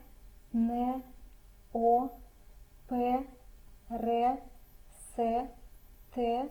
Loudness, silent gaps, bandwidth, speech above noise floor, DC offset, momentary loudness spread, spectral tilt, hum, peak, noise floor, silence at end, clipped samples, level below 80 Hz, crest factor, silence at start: -33 LUFS; none; 20 kHz; 24 dB; under 0.1%; 15 LU; -6.5 dB/octave; none; -16 dBFS; -54 dBFS; 0 s; under 0.1%; -54 dBFS; 18 dB; 0 s